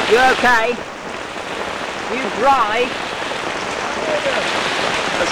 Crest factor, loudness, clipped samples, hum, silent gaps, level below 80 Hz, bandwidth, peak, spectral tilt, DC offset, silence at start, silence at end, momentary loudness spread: 14 dB; -18 LUFS; under 0.1%; none; none; -46 dBFS; over 20 kHz; -4 dBFS; -2.5 dB/octave; under 0.1%; 0 s; 0 s; 12 LU